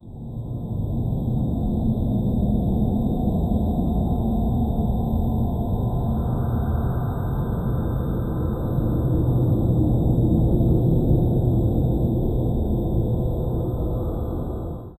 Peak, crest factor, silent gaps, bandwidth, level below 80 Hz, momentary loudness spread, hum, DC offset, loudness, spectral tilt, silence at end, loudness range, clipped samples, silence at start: -8 dBFS; 14 dB; none; 13 kHz; -28 dBFS; 6 LU; none; under 0.1%; -23 LUFS; -11 dB/octave; 0.05 s; 4 LU; under 0.1%; 0.05 s